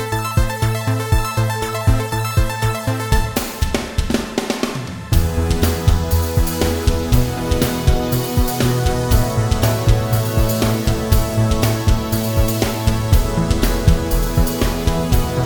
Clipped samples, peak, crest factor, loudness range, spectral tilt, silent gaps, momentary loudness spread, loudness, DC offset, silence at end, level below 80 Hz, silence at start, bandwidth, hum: under 0.1%; 0 dBFS; 16 dB; 2 LU; -5.5 dB/octave; none; 4 LU; -18 LUFS; under 0.1%; 0 s; -22 dBFS; 0 s; 19.5 kHz; none